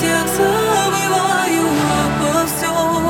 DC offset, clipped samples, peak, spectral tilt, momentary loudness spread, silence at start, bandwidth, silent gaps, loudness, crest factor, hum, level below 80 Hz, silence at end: under 0.1%; under 0.1%; -4 dBFS; -4 dB/octave; 2 LU; 0 s; 19.5 kHz; none; -16 LUFS; 12 dB; none; -40 dBFS; 0 s